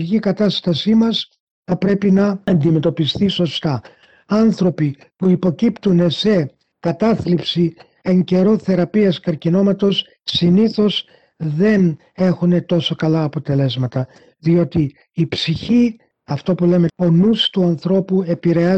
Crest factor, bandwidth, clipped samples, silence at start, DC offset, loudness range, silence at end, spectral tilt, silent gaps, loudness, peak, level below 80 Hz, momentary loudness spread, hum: 10 dB; 8 kHz; under 0.1%; 0 s; under 0.1%; 2 LU; 0 s; -7.5 dB/octave; 1.40-1.63 s; -17 LUFS; -6 dBFS; -52 dBFS; 8 LU; none